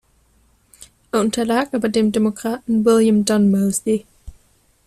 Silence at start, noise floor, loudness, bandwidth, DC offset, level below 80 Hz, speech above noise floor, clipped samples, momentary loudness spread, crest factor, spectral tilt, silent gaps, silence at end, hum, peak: 0.8 s; -58 dBFS; -18 LUFS; 14 kHz; under 0.1%; -50 dBFS; 41 dB; under 0.1%; 8 LU; 14 dB; -5.5 dB/octave; none; 0.55 s; none; -4 dBFS